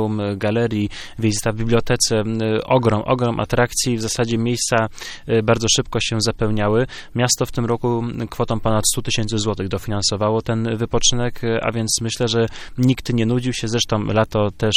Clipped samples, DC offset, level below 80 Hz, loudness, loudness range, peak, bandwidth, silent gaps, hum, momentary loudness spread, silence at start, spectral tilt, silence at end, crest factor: under 0.1%; under 0.1%; -36 dBFS; -19 LUFS; 1 LU; -2 dBFS; 16 kHz; none; none; 5 LU; 0 s; -4.5 dB/octave; 0 s; 18 dB